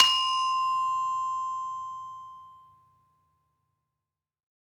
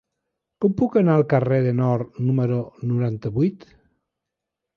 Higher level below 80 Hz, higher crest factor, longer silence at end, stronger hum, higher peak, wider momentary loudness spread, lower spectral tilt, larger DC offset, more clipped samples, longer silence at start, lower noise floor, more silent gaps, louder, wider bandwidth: second, -78 dBFS vs -56 dBFS; first, 30 dB vs 18 dB; first, 2.15 s vs 1.2 s; neither; about the same, -2 dBFS vs -4 dBFS; first, 19 LU vs 7 LU; second, 2.5 dB/octave vs -11 dB/octave; neither; neither; second, 0 s vs 0.6 s; first, under -90 dBFS vs -84 dBFS; neither; second, -27 LUFS vs -21 LUFS; first, 17 kHz vs 6 kHz